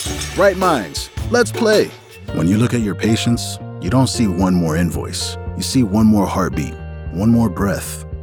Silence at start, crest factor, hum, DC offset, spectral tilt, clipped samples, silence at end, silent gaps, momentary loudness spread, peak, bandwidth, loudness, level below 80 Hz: 0 s; 16 dB; none; under 0.1%; -5.5 dB/octave; under 0.1%; 0 s; none; 11 LU; -2 dBFS; 19.5 kHz; -17 LUFS; -36 dBFS